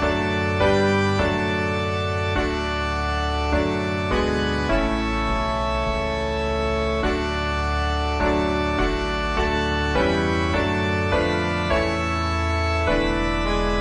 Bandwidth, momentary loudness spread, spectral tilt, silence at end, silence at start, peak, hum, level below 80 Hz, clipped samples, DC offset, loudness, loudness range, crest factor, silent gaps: 10.5 kHz; 3 LU; -6 dB/octave; 0 s; 0 s; -6 dBFS; none; -30 dBFS; under 0.1%; 0.2%; -22 LUFS; 1 LU; 16 dB; none